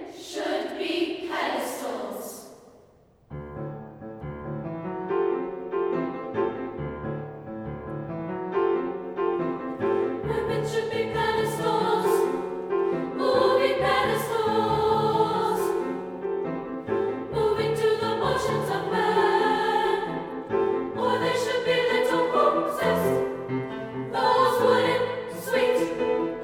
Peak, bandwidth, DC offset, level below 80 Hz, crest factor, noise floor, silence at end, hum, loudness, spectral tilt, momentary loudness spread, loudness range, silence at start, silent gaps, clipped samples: -8 dBFS; 18 kHz; under 0.1%; -54 dBFS; 18 dB; -57 dBFS; 0 s; none; -26 LUFS; -5.5 dB/octave; 13 LU; 8 LU; 0 s; none; under 0.1%